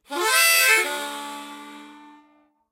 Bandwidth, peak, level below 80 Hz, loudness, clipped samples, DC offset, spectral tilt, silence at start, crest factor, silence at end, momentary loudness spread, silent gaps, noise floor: 16 kHz; -4 dBFS; -80 dBFS; -17 LUFS; under 0.1%; under 0.1%; 2 dB/octave; 0.1 s; 20 dB; 0.75 s; 23 LU; none; -60 dBFS